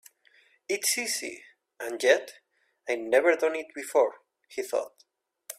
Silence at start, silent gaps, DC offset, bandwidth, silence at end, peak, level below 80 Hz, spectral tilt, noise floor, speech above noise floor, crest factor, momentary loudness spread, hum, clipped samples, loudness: 0.7 s; none; under 0.1%; 16 kHz; 0.05 s; -8 dBFS; -80 dBFS; -0.5 dB/octave; -63 dBFS; 36 dB; 22 dB; 19 LU; none; under 0.1%; -27 LUFS